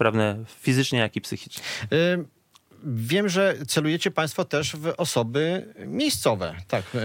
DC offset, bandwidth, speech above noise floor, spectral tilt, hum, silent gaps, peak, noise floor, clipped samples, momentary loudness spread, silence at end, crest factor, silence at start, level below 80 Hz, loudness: under 0.1%; 17 kHz; 29 dB; -4.5 dB/octave; none; none; -6 dBFS; -54 dBFS; under 0.1%; 10 LU; 0 s; 20 dB; 0 s; -66 dBFS; -25 LUFS